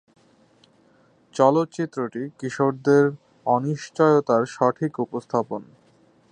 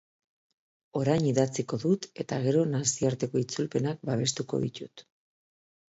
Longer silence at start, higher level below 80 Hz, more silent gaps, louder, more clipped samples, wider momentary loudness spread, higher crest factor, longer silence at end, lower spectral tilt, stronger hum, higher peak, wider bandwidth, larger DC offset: first, 1.35 s vs 0.95 s; second, -72 dBFS vs -64 dBFS; neither; first, -22 LUFS vs -29 LUFS; neither; first, 12 LU vs 8 LU; about the same, 20 dB vs 20 dB; second, 0.7 s vs 0.9 s; first, -7 dB/octave vs -5.5 dB/octave; neither; first, -4 dBFS vs -10 dBFS; first, 9.8 kHz vs 8.2 kHz; neither